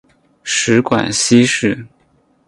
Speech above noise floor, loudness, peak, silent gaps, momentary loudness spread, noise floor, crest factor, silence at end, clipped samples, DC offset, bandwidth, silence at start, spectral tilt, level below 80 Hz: 43 dB; -14 LUFS; 0 dBFS; none; 11 LU; -56 dBFS; 16 dB; 0.6 s; under 0.1%; under 0.1%; 11.5 kHz; 0.45 s; -3.5 dB/octave; -52 dBFS